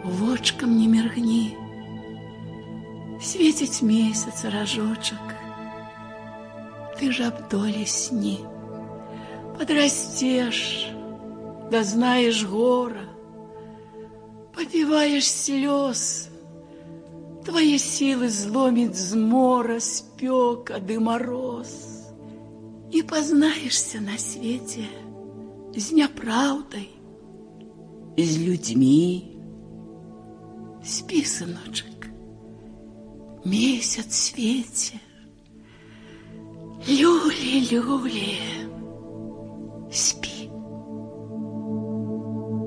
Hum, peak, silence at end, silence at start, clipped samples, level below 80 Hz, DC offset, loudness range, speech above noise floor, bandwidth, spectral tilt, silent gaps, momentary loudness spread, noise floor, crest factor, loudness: none; -8 dBFS; 0 s; 0 s; under 0.1%; -58 dBFS; under 0.1%; 6 LU; 27 dB; 10.5 kHz; -3.5 dB/octave; none; 23 LU; -50 dBFS; 18 dB; -23 LUFS